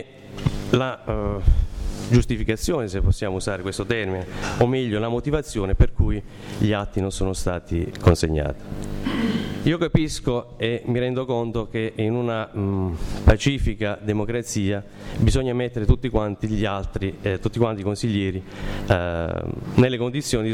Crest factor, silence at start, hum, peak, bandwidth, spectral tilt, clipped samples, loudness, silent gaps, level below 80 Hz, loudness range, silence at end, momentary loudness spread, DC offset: 16 dB; 0 s; none; -6 dBFS; 15.5 kHz; -6.5 dB/octave; under 0.1%; -24 LUFS; none; -28 dBFS; 1 LU; 0 s; 8 LU; under 0.1%